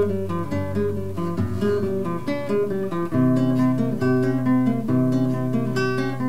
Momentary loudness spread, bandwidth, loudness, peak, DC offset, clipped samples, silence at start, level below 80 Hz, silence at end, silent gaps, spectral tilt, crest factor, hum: 6 LU; 15.5 kHz; -23 LUFS; -8 dBFS; 2%; under 0.1%; 0 s; -58 dBFS; 0 s; none; -8.5 dB/octave; 12 dB; none